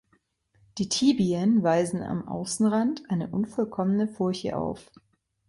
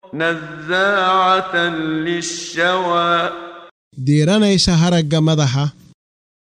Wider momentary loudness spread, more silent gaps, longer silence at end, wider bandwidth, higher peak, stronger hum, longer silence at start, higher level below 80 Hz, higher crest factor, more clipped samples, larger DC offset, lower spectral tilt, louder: about the same, 9 LU vs 10 LU; second, none vs 3.71-3.91 s; about the same, 0.65 s vs 0.75 s; about the same, 11.5 kHz vs 10.5 kHz; second, -10 dBFS vs -2 dBFS; neither; first, 0.75 s vs 0.15 s; second, -60 dBFS vs -44 dBFS; about the same, 16 dB vs 14 dB; neither; neither; about the same, -5.5 dB/octave vs -5 dB/octave; second, -26 LUFS vs -16 LUFS